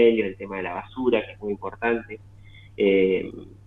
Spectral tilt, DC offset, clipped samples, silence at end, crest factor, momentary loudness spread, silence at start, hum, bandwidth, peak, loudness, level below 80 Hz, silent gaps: -8 dB/octave; under 0.1%; under 0.1%; 0.1 s; 18 dB; 17 LU; 0 s; none; 4 kHz; -6 dBFS; -25 LUFS; -54 dBFS; none